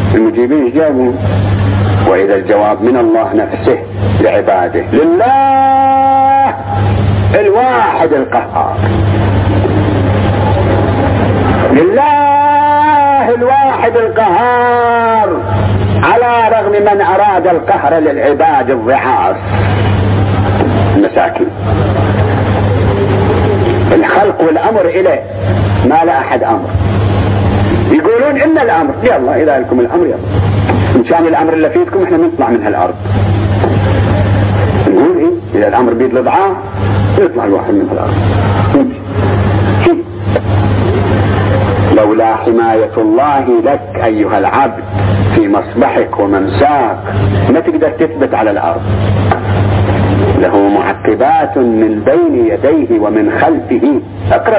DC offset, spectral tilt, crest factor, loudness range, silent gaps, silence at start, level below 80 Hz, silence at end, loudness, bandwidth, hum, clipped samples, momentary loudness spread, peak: under 0.1%; -11.5 dB/octave; 10 dB; 2 LU; none; 0 s; -26 dBFS; 0 s; -10 LUFS; 4 kHz; none; under 0.1%; 4 LU; 0 dBFS